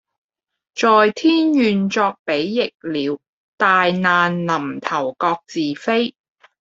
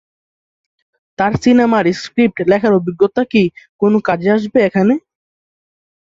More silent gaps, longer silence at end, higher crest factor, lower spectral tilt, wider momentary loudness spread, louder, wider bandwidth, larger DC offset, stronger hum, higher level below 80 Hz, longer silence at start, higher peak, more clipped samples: first, 2.19-2.25 s, 2.75-2.80 s, 3.29-3.58 s vs 3.69-3.79 s; second, 0.5 s vs 1.05 s; about the same, 18 dB vs 14 dB; second, -5.5 dB/octave vs -7 dB/octave; first, 9 LU vs 6 LU; second, -18 LUFS vs -14 LUFS; about the same, 7.8 kHz vs 7.8 kHz; neither; neither; second, -64 dBFS vs -50 dBFS; second, 0.75 s vs 1.2 s; about the same, -2 dBFS vs 0 dBFS; neither